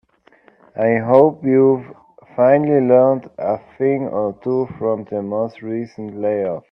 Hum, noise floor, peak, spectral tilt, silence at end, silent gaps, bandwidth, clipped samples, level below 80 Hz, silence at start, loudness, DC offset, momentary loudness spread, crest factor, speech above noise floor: none; -53 dBFS; 0 dBFS; -10.5 dB/octave; 0.1 s; none; 5.6 kHz; under 0.1%; -62 dBFS; 0.75 s; -17 LUFS; under 0.1%; 12 LU; 18 dB; 36 dB